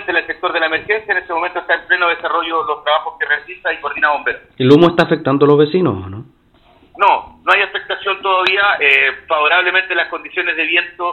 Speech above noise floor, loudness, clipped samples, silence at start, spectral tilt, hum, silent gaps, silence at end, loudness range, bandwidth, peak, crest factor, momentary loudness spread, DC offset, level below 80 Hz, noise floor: 35 dB; -14 LUFS; 0.1%; 0 s; -6.5 dB/octave; none; none; 0 s; 3 LU; 8.4 kHz; 0 dBFS; 16 dB; 9 LU; under 0.1%; -54 dBFS; -50 dBFS